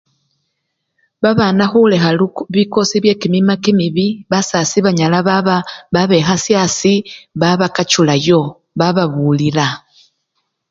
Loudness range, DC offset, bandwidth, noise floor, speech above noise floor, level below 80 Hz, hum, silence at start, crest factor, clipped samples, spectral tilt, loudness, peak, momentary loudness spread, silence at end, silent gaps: 1 LU; under 0.1%; 7.8 kHz; -71 dBFS; 58 dB; -52 dBFS; none; 1.2 s; 14 dB; under 0.1%; -5 dB/octave; -14 LUFS; 0 dBFS; 6 LU; 0.95 s; none